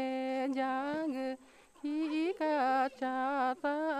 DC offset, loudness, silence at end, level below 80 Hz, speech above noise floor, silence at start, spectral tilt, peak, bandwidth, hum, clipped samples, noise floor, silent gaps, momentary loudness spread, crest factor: under 0.1%; -34 LUFS; 0 s; -76 dBFS; 22 dB; 0 s; -4.5 dB/octave; -22 dBFS; 12.5 kHz; none; under 0.1%; -56 dBFS; none; 8 LU; 12 dB